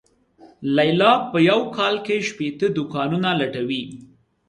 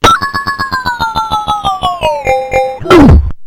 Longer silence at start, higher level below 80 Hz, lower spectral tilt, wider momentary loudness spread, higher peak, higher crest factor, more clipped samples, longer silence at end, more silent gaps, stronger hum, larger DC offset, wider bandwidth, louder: first, 0.45 s vs 0.05 s; second, -62 dBFS vs -18 dBFS; about the same, -6 dB/octave vs -5.5 dB/octave; about the same, 10 LU vs 10 LU; second, -4 dBFS vs 0 dBFS; first, 18 dB vs 10 dB; second, under 0.1% vs 3%; first, 0.45 s vs 0 s; neither; neither; neither; second, 11 kHz vs 16.5 kHz; second, -20 LUFS vs -10 LUFS